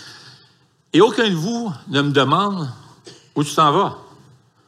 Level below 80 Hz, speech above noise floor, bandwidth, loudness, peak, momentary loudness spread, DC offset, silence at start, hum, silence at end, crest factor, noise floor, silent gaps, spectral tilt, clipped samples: -68 dBFS; 39 dB; 15 kHz; -18 LUFS; -2 dBFS; 13 LU; under 0.1%; 0 s; none; 0.65 s; 18 dB; -56 dBFS; none; -5.5 dB/octave; under 0.1%